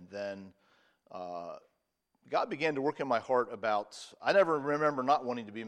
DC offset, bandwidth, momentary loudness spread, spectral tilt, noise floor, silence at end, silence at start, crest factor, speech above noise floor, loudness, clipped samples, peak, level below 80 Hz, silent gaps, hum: under 0.1%; 11 kHz; 18 LU; -5 dB/octave; -80 dBFS; 0 s; 0 s; 20 dB; 48 dB; -32 LUFS; under 0.1%; -14 dBFS; -82 dBFS; none; none